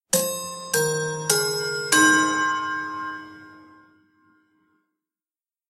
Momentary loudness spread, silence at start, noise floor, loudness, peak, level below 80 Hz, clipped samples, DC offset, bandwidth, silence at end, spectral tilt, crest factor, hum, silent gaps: 15 LU; 0.15 s; under -90 dBFS; -21 LUFS; -2 dBFS; -68 dBFS; under 0.1%; under 0.1%; 16 kHz; 2.05 s; -2 dB/octave; 24 dB; none; none